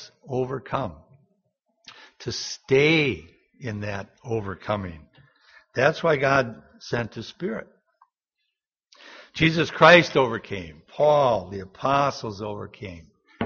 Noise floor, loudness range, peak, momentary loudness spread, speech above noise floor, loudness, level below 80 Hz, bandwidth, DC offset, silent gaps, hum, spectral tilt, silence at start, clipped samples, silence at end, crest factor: -81 dBFS; 7 LU; 0 dBFS; 19 LU; 58 dB; -23 LUFS; -54 dBFS; 7 kHz; under 0.1%; none; none; -3.5 dB/octave; 0 s; under 0.1%; 0 s; 24 dB